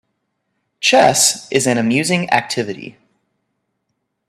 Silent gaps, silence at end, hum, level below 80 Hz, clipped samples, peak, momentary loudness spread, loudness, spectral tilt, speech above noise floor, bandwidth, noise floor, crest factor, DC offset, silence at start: none; 1.4 s; none; -62 dBFS; under 0.1%; 0 dBFS; 11 LU; -14 LUFS; -3 dB/octave; 57 dB; 15.5 kHz; -73 dBFS; 18 dB; under 0.1%; 0.8 s